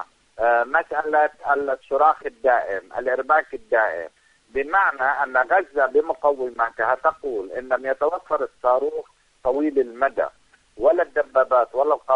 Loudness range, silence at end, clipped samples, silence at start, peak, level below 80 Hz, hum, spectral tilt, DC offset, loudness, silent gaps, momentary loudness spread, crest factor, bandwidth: 3 LU; 0 s; under 0.1%; 0 s; -4 dBFS; -58 dBFS; none; -5.5 dB/octave; under 0.1%; -22 LUFS; none; 9 LU; 18 dB; 9.4 kHz